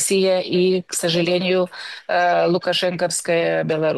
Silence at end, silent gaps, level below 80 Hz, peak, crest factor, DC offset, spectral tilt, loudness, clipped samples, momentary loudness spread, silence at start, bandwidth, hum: 0 s; none; -66 dBFS; -8 dBFS; 10 dB; under 0.1%; -4 dB/octave; -19 LUFS; under 0.1%; 5 LU; 0 s; 12.5 kHz; none